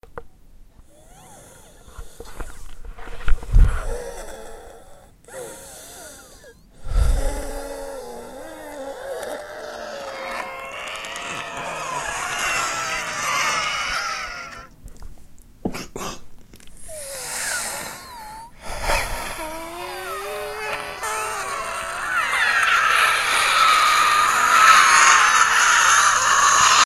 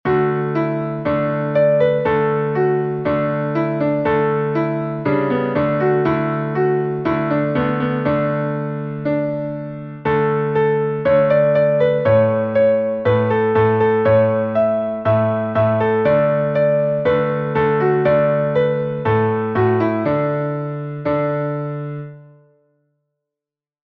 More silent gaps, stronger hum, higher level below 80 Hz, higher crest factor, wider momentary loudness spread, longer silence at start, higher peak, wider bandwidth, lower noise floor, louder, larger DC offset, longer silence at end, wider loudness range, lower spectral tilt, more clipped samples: neither; neither; first, -30 dBFS vs -50 dBFS; first, 22 dB vs 14 dB; first, 24 LU vs 7 LU; about the same, 0.1 s vs 0.05 s; first, 0 dBFS vs -4 dBFS; first, 16 kHz vs 5 kHz; second, -47 dBFS vs -88 dBFS; about the same, -19 LUFS vs -18 LUFS; neither; second, 0 s vs 1.7 s; first, 18 LU vs 5 LU; second, -1 dB/octave vs -10.5 dB/octave; neither